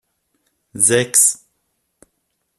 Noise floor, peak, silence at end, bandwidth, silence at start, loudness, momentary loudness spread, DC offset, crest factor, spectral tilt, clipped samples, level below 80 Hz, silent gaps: -71 dBFS; 0 dBFS; 1.25 s; 15 kHz; 0.75 s; -13 LUFS; 21 LU; under 0.1%; 20 dB; -2 dB/octave; under 0.1%; -60 dBFS; none